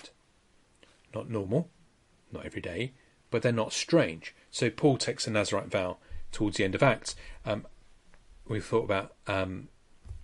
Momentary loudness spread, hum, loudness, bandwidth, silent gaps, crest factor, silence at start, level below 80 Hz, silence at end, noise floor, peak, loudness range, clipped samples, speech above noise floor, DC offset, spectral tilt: 16 LU; none; -30 LUFS; 11.5 kHz; none; 20 dB; 0.05 s; -52 dBFS; 0 s; -65 dBFS; -10 dBFS; 6 LU; under 0.1%; 35 dB; under 0.1%; -5 dB/octave